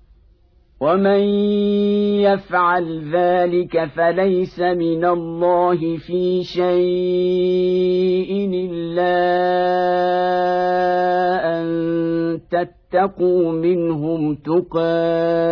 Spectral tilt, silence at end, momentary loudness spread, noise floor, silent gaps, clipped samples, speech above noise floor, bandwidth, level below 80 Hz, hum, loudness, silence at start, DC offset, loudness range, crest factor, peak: -8.5 dB/octave; 0 s; 5 LU; -53 dBFS; none; under 0.1%; 36 dB; 5.4 kHz; -52 dBFS; none; -18 LUFS; 0.8 s; under 0.1%; 2 LU; 14 dB; -4 dBFS